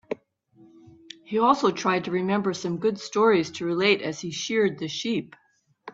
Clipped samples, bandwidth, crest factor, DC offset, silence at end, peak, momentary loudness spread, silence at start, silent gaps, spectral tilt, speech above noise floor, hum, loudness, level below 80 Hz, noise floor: under 0.1%; 7.8 kHz; 20 dB; under 0.1%; 0.05 s; -6 dBFS; 10 LU; 0.1 s; none; -4.5 dB/octave; 33 dB; none; -24 LUFS; -68 dBFS; -58 dBFS